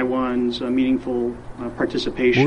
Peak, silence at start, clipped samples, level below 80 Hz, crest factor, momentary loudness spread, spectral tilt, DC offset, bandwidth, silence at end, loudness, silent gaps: -4 dBFS; 0 s; under 0.1%; -44 dBFS; 16 dB; 8 LU; -6.5 dB/octave; under 0.1%; 9 kHz; 0 s; -22 LUFS; none